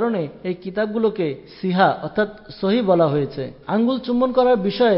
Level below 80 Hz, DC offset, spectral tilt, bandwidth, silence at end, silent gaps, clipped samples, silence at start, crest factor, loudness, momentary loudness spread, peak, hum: -56 dBFS; under 0.1%; -10.5 dB/octave; 5.8 kHz; 0 s; none; under 0.1%; 0 s; 16 dB; -20 LUFS; 10 LU; -4 dBFS; none